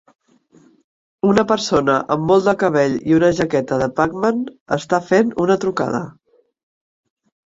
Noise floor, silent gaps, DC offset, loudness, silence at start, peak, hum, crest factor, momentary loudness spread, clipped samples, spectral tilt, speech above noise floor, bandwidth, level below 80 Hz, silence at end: -52 dBFS; 4.60-4.66 s; under 0.1%; -17 LUFS; 1.25 s; -2 dBFS; none; 18 dB; 8 LU; under 0.1%; -6 dB/octave; 36 dB; 7.8 kHz; -52 dBFS; 1.35 s